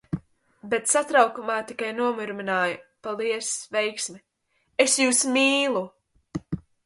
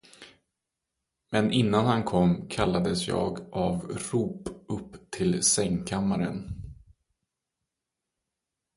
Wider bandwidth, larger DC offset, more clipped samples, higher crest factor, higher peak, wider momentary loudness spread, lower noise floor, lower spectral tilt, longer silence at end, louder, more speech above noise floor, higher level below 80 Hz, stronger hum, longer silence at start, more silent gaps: about the same, 12 kHz vs 11.5 kHz; neither; neither; about the same, 22 dB vs 22 dB; first, -4 dBFS vs -8 dBFS; about the same, 16 LU vs 14 LU; second, -71 dBFS vs -86 dBFS; second, -2.5 dB/octave vs -5 dB/octave; second, 0.25 s vs 2.05 s; first, -24 LUFS vs -27 LUFS; second, 47 dB vs 60 dB; second, -60 dBFS vs -50 dBFS; neither; about the same, 0.1 s vs 0.2 s; neither